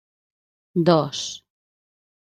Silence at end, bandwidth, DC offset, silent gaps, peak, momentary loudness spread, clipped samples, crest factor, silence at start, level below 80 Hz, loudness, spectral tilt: 1 s; 9.6 kHz; under 0.1%; none; -2 dBFS; 14 LU; under 0.1%; 24 dB; 0.75 s; -66 dBFS; -22 LUFS; -5.5 dB/octave